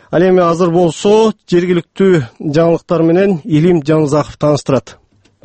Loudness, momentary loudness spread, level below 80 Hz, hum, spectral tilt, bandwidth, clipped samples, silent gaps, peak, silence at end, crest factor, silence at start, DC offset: -12 LUFS; 4 LU; -46 dBFS; none; -7 dB/octave; 8.8 kHz; under 0.1%; none; 0 dBFS; 0.55 s; 12 dB; 0.1 s; under 0.1%